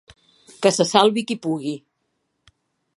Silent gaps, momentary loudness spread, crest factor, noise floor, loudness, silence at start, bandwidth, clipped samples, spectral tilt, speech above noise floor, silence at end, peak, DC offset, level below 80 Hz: none; 13 LU; 22 dB; -73 dBFS; -20 LUFS; 0.6 s; 11.5 kHz; under 0.1%; -4 dB/octave; 54 dB; 1.2 s; 0 dBFS; under 0.1%; -68 dBFS